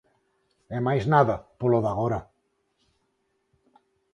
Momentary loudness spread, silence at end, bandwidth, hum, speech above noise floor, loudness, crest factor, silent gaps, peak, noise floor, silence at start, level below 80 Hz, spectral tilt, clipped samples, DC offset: 10 LU; 1.9 s; 10.5 kHz; none; 50 dB; -25 LUFS; 22 dB; none; -6 dBFS; -73 dBFS; 0.7 s; -54 dBFS; -8.5 dB/octave; under 0.1%; under 0.1%